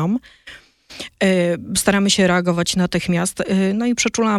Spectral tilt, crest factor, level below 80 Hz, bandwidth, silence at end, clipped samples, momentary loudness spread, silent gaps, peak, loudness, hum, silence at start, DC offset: -4.5 dB/octave; 16 dB; -48 dBFS; 14.5 kHz; 0 s; under 0.1%; 7 LU; none; -2 dBFS; -18 LUFS; none; 0 s; under 0.1%